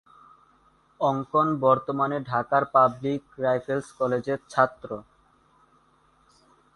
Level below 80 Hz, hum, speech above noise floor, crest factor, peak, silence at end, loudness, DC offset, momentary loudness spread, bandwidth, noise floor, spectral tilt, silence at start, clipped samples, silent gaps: -64 dBFS; none; 38 dB; 22 dB; -6 dBFS; 1.75 s; -25 LUFS; under 0.1%; 10 LU; 11.5 kHz; -62 dBFS; -7 dB/octave; 1 s; under 0.1%; none